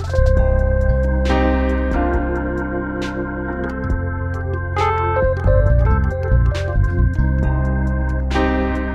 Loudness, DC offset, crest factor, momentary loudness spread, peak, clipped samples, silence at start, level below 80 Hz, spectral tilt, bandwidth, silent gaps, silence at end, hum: -19 LUFS; under 0.1%; 14 dB; 7 LU; -2 dBFS; under 0.1%; 0 s; -20 dBFS; -8 dB/octave; 7.6 kHz; none; 0 s; none